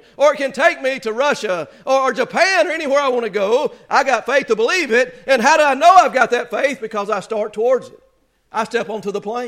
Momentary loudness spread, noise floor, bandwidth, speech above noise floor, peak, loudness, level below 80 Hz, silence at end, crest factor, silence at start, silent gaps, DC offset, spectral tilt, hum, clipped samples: 11 LU; -55 dBFS; 15 kHz; 39 dB; 0 dBFS; -16 LUFS; -62 dBFS; 0 s; 16 dB; 0.2 s; none; under 0.1%; -3 dB/octave; none; under 0.1%